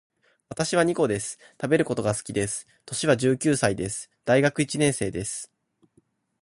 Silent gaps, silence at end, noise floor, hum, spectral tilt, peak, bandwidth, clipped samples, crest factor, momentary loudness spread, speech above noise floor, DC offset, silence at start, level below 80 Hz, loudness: none; 1 s; -66 dBFS; none; -4.5 dB/octave; -6 dBFS; 11.5 kHz; under 0.1%; 20 dB; 12 LU; 41 dB; under 0.1%; 0.5 s; -56 dBFS; -25 LUFS